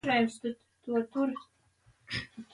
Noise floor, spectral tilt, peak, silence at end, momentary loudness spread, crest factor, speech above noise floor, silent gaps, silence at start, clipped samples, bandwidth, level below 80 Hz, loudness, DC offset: -67 dBFS; -5 dB/octave; -14 dBFS; 0.1 s; 13 LU; 18 dB; 35 dB; none; 0.05 s; under 0.1%; 11.5 kHz; -64 dBFS; -33 LUFS; under 0.1%